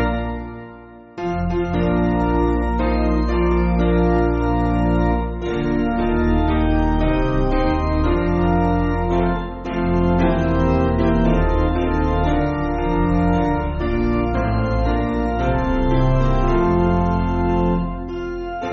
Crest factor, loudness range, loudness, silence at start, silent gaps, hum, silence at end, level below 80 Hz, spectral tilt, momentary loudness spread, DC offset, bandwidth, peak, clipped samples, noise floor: 14 dB; 1 LU; -19 LUFS; 0 s; none; none; 0 s; -24 dBFS; -7.5 dB/octave; 6 LU; under 0.1%; 6.6 kHz; -4 dBFS; under 0.1%; -40 dBFS